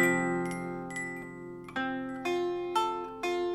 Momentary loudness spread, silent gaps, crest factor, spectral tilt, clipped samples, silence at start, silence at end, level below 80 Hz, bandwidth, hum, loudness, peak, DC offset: 9 LU; none; 18 dB; -5 dB/octave; under 0.1%; 0 s; 0 s; -64 dBFS; 14 kHz; none; -33 LUFS; -14 dBFS; under 0.1%